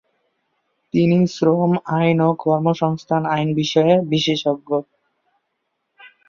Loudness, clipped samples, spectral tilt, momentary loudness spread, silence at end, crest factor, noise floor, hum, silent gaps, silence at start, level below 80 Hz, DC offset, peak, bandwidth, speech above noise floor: -18 LUFS; under 0.1%; -7 dB/octave; 6 LU; 0.2 s; 16 dB; -74 dBFS; none; none; 0.95 s; -60 dBFS; under 0.1%; -2 dBFS; 7.2 kHz; 56 dB